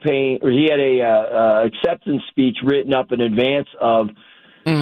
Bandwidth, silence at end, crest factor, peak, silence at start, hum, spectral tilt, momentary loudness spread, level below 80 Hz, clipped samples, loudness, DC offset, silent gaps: 9.4 kHz; 0 s; 12 dB; -4 dBFS; 0 s; none; -8 dB/octave; 6 LU; -56 dBFS; under 0.1%; -18 LUFS; under 0.1%; none